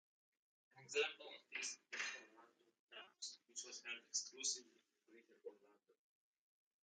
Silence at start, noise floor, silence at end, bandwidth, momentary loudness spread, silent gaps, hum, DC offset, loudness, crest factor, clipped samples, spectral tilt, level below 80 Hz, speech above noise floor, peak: 0.75 s; -71 dBFS; 1.1 s; 9.6 kHz; 18 LU; 2.79-2.88 s; none; under 0.1%; -47 LUFS; 24 dB; under 0.1%; 1 dB/octave; under -90 dBFS; 22 dB; -28 dBFS